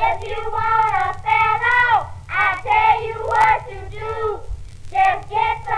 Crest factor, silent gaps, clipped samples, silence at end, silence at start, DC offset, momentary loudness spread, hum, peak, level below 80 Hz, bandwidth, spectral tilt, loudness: 16 dB; none; under 0.1%; 0 s; 0 s; under 0.1%; 12 LU; none; -4 dBFS; -38 dBFS; 11 kHz; -4 dB/octave; -18 LUFS